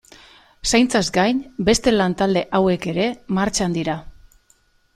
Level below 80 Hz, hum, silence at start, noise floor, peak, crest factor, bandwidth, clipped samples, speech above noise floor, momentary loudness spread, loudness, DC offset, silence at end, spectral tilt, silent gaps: -42 dBFS; none; 0.65 s; -59 dBFS; -2 dBFS; 18 dB; 14.5 kHz; under 0.1%; 40 dB; 7 LU; -19 LUFS; under 0.1%; 0.85 s; -4.5 dB/octave; none